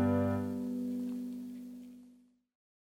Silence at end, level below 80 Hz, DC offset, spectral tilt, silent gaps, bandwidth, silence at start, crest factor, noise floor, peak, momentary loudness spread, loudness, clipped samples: 0.8 s; -76 dBFS; under 0.1%; -9 dB/octave; none; 16 kHz; 0 s; 16 dB; -63 dBFS; -20 dBFS; 19 LU; -37 LUFS; under 0.1%